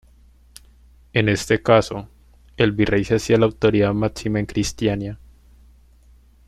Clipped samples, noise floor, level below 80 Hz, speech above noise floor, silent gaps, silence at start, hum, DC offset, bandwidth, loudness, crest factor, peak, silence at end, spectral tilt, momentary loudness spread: under 0.1%; -51 dBFS; -42 dBFS; 32 dB; none; 1.15 s; none; under 0.1%; 14 kHz; -20 LUFS; 20 dB; -2 dBFS; 1.3 s; -6 dB/octave; 11 LU